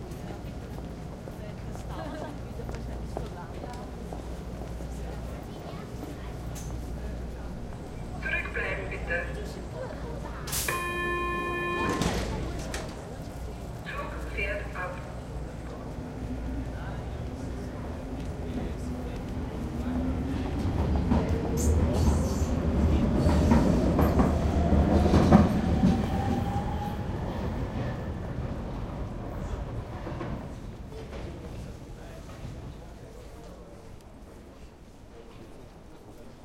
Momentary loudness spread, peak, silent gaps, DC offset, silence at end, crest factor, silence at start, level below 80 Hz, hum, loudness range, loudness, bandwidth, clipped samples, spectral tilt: 19 LU; -4 dBFS; none; under 0.1%; 0 s; 26 dB; 0 s; -36 dBFS; none; 16 LU; -31 LUFS; 16 kHz; under 0.1%; -6.5 dB/octave